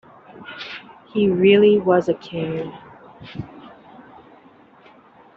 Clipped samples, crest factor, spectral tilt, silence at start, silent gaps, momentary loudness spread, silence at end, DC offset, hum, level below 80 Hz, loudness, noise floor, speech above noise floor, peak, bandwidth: under 0.1%; 18 dB; -5 dB/octave; 0.4 s; none; 24 LU; 1.7 s; under 0.1%; none; -60 dBFS; -18 LUFS; -50 dBFS; 32 dB; -4 dBFS; 6.4 kHz